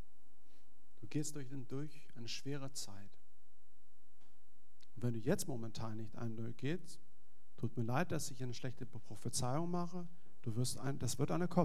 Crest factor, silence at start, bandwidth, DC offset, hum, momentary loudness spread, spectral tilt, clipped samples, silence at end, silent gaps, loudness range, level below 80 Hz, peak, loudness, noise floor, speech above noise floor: 26 dB; 1 s; 15.5 kHz; 1%; none; 13 LU; -5.5 dB/octave; under 0.1%; 0 s; none; 7 LU; -70 dBFS; -16 dBFS; -43 LUFS; -76 dBFS; 35 dB